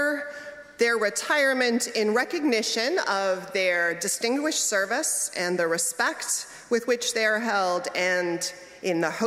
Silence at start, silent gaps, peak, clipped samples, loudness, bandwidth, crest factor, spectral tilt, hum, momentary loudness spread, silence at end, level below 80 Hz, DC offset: 0 s; none; -10 dBFS; under 0.1%; -25 LUFS; 16 kHz; 16 dB; -2 dB/octave; none; 6 LU; 0 s; -74 dBFS; under 0.1%